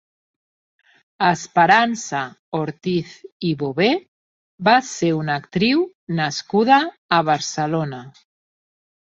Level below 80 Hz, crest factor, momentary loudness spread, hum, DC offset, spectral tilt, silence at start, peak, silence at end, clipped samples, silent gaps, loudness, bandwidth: -62 dBFS; 20 dB; 11 LU; none; under 0.1%; -4.5 dB/octave; 1.2 s; 0 dBFS; 1.05 s; under 0.1%; 2.39-2.52 s, 3.32-3.40 s, 4.08-4.58 s, 5.95-6.07 s, 6.98-7.09 s; -19 LUFS; 8 kHz